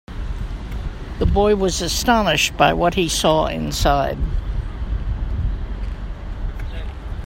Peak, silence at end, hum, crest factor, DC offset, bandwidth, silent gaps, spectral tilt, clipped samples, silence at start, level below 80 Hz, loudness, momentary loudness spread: 0 dBFS; 0 s; none; 20 dB; under 0.1%; 16.5 kHz; none; -4.5 dB/octave; under 0.1%; 0.1 s; -26 dBFS; -20 LUFS; 15 LU